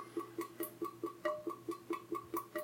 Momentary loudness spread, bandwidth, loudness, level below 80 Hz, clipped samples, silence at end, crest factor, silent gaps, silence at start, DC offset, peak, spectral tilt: 4 LU; 17 kHz; -43 LUFS; -82 dBFS; under 0.1%; 0 s; 20 dB; none; 0 s; under 0.1%; -24 dBFS; -5 dB/octave